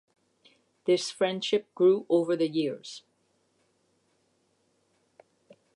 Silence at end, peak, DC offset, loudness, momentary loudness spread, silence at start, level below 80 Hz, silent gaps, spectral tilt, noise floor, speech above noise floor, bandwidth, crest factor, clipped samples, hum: 2.75 s; -12 dBFS; under 0.1%; -27 LUFS; 15 LU; 0.85 s; -86 dBFS; none; -5 dB/octave; -72 dBFS; 45 dB; 11.5 kHz; 18 dB; under 0.1%; none